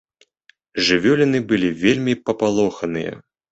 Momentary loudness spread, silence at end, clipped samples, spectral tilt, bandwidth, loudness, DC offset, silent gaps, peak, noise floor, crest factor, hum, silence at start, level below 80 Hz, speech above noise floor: 10 LU; 0.3 s; under 0.1%; -5 dB/octave; 8.2 kHz; -19 LUFS; under 0.1%; none; -2 dBFS; -58 dBFS; 18 dB; none; 0.75 s; -54 dBFS; 40 dB